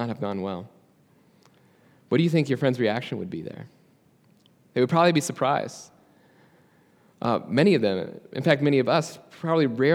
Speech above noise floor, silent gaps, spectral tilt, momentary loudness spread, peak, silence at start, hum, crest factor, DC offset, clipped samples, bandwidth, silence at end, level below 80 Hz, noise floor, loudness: 37 dB; none; -6 dB/octave; 15 LU; -4 dBFS; 0 s; none; 22 dB; under 0.1%; under 0.1%; 15 kHz; 0 s; -74 dBFS; -60 dBFS; -24 LUFS